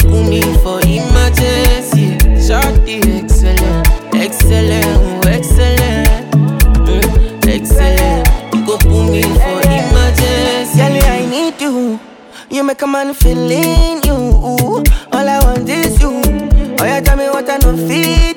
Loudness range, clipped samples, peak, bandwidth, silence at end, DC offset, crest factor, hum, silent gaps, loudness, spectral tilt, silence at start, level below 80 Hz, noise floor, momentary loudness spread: 2 LU; under 0.1%; 0 dBFS; 19 kHz; 0 s; under 0.1%; 10 dB; none; none; -12 LUFS; -5.5 dB/octave; 0 s; -12 dBFS; -34 dBFS; 4 LU